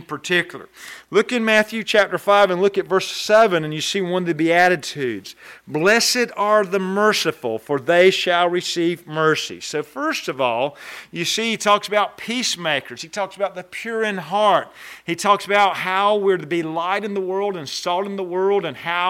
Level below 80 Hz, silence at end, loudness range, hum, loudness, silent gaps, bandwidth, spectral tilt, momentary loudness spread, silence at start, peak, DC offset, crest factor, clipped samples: -66 dBFS; 0 s; 4 LU; none; -19 LUFS; none; 16.5 kHz; -3.5 dB/octave; 12 LU; 0 s; -4 dBFS; under 0.1%; 16 dB; under 0.1%